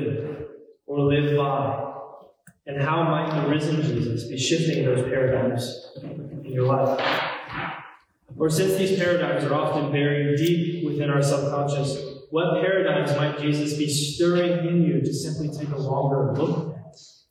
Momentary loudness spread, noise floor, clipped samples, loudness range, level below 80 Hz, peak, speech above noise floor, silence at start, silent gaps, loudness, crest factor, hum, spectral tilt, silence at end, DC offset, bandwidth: 12 LU; -51 dBFS; under 0.1%; 3 LU; -58 dBFS; -10 dBFS; 28 dB; 0 s; none; -24 LUFS; 14 dB; none; -6 dB/octave; 0.25 s; under 0.1%; 16 kHz